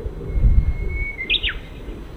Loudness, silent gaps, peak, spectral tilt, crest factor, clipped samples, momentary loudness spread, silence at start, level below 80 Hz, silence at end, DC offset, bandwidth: -22 LUFS; none; -2 dBFS; -6.5 dB/octave; 18 dB; under 0.1%; 15 LU; 0 s; -22 dBFS; 0 s; under 0.1%; 4.3 kHz